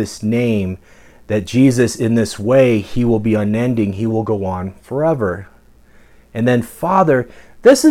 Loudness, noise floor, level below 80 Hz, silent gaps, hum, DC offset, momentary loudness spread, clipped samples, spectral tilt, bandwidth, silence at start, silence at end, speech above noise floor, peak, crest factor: -16 LUFS; -46 dBFS; -44 dBFS; none; none; under 0.1%; 11 LU; under 0.1%; -6.5 dB/octave; 16 kHz; 0 s; 0 s; 31 dB; -2 dBFS; 14 dB